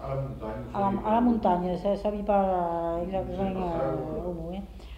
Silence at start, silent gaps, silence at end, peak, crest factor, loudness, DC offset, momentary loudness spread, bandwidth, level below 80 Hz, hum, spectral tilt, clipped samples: 0 s; none; 0 s; -12 dBFS; 16 dB; -28 LUFS; under 0.1%; 11 LU; 9.8 kHz; -44 dBFS; none; -9 dB/octave; under 0.1%